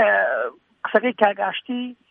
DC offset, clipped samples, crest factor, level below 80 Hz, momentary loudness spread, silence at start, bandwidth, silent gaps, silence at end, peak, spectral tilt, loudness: under 0.1%; under 0.1%; 20 dB; -74 dBFS; 12 LU; 0 s; 4.4 kHz; none; 0.2 s; -2 dBFS; -7 dB/octave; -22 LUFS